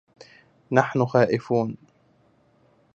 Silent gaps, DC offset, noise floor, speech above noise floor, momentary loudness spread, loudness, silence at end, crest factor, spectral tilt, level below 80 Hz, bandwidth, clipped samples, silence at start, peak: none; under 0.1%; -61 dBFS; 40 dB; 9 LU; -23 LUFS; 1.2 s; 24 dB; -7.5 dB/octave; -66 dBFS; 7.8 kHz; under 0.1%; 0.7 s; -2 dBFS